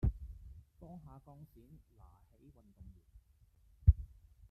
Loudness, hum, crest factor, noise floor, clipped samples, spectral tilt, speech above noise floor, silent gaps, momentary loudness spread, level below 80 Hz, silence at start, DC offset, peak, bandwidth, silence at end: -34 LUFS; none; 26 dB; -68 dBFS; under 0.1%; -11 dB/octave; 9 dB; none; 28 LU; -42 dBFS; 0.05 s; under 0.1%; -12 dBFS; 1.6 kHz; 0.5 s